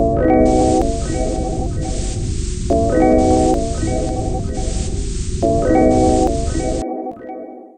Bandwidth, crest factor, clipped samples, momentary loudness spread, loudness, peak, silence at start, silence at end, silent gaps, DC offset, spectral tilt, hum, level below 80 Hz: 9.6 kHz; 14 dB; under 0.1%; 11 LU; -17 LUFS; -2 dBFS; 0 s; 0.1 s; none; under 0.1%; -6.5 dB/octave; none; -24 dBFS